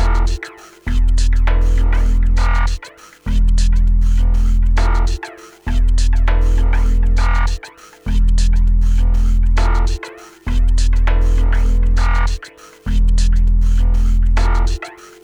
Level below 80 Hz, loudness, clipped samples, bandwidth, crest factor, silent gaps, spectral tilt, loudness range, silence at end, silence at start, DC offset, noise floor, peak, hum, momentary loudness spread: -14 dBFS; -18 LUFS; under 0.1%; 9 kHz; 10 dB; none; -5.5 dB/octave; 1 LU; 0.3 s; 0 s; under 0.1%; -38 dBFS; -4 dBFS; none; 12 LU